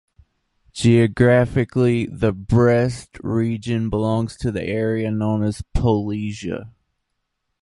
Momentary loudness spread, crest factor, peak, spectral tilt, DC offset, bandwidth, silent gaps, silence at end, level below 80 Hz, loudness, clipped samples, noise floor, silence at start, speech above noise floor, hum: 11 LU; 18 dB; -2 dBFS; -7.5 dB/octave; under 0.1%; 11.5 kHz; none; 0.95 s; -36 dBFS; -20 LUFS; under 0.1%; -75 dBFS; 0.75 s; 56 dB; none